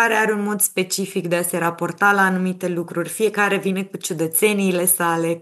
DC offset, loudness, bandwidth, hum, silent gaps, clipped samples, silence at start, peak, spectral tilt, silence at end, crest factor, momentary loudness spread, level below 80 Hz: under 0.1%; -19 LUFS; 13 kHz; none; none; under 0.1%; 0 s; -4 dBFS; -4 dB/octave; 0 s; 16 dB; 7 LU; under -90 dBFS